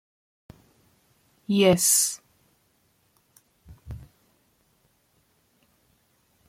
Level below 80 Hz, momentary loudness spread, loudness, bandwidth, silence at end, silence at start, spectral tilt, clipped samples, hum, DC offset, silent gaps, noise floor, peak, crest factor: -58 dBFS; 26 LU; -20 LUFS; 16.5 kHz; 2.5 s; 1.5 s; -3.5 dB/octave; under 0.1%; none; under 0.1%; none; -67 dBFS; -6 dBFS; 24 dB